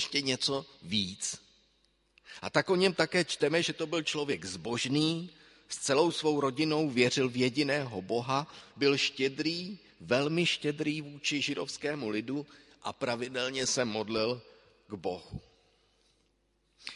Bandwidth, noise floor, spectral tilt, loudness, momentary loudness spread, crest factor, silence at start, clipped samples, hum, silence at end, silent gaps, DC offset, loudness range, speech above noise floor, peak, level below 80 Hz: 11.5 kHz; -73 dBFS; -4 dB/octave; -31 LUFS; 15 LU; 22 dB; 0 s; under 0.1%; none; 0 s; none; under 0.1%; 5 LU; 42 dB; -10 dBFS; -66 dBFS